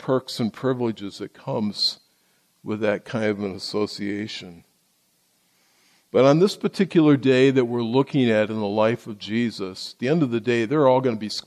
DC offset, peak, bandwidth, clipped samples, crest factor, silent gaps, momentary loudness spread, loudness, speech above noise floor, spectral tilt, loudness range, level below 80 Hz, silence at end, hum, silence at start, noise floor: under 0.1%; -6 dBFS; 13 kHz; under 0.1%; 18 dB; none; 14 LU; -22 LUFS; 44 dB; -6 dB/octave; 9 LU; -66 dBFS; 0.05 s; none; 0 s; -65 dBFS